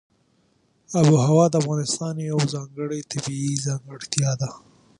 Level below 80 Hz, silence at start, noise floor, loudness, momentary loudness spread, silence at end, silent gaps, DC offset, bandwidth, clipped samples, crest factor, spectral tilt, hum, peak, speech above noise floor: -62 dBFS; 0.9 s; -64 dBFS; -23 LUFS; 13 LU; 0.4 s; none; under 0.1%; 11 kHz; under 0.1%; 22 dB; -5.5 dB/octave; none; 0 dBFS; 42 dB